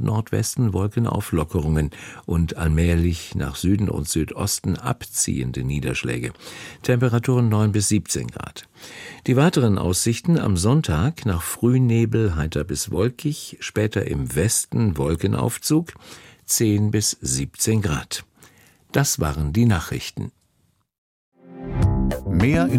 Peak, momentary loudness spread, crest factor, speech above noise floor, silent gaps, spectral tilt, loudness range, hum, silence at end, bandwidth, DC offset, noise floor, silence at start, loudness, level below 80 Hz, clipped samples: -6 dBFS; 12 LU; 16 dB; 45 dB; 20.98-21.32 s; -5.5 dB/octave; 4 LU; none; 0 s; 16.5 kHz; under 0.1%; -66 dBFS; 0 s; -22 LUFS; -36 dBFS; under 0.1%